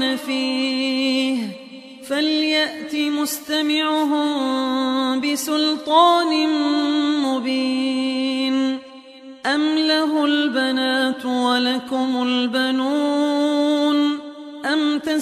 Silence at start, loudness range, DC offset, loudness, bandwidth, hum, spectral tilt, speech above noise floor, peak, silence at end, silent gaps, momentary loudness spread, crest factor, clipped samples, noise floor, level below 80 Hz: 0 s; 3 LU; under 0.1%; -20 LUFS; 15 kHz; none; -2.5 dB/octave; 21 dB; -4 dBFS; 0 s; none; 5 LU; 16 dB; under 0.1%; -41 dBFS; -68 dBFS